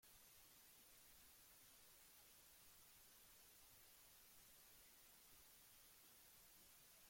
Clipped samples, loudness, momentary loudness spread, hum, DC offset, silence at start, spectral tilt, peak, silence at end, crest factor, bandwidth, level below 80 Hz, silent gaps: under 0.1%; -66 LUFS; 0 LU; none; under 0.1%; 0 s; -0.5 dB/octave; -56 dBFS; 0 s; 14 dB; 16.5 kHz; -84 dBFS; none